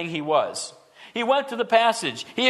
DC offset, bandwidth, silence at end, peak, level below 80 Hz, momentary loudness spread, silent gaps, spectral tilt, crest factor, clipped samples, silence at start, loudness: under 0.1%; 13 kHz; 0 s; -4 dBFS; -76 dBFS; 14 LU; none; -3 dB/octave; 20 dB; under 0.1%; 0 s; -23 LUFS